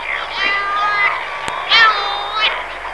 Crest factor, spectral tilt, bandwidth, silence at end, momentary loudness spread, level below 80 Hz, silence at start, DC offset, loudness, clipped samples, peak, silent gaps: 18 dB; -1 dB/octave; 11 kHz; 0 s; 12 LU; -48 dBFS; 0 s; 0.7%; -15 LUFS; under 0.1%; 0 dBFS; none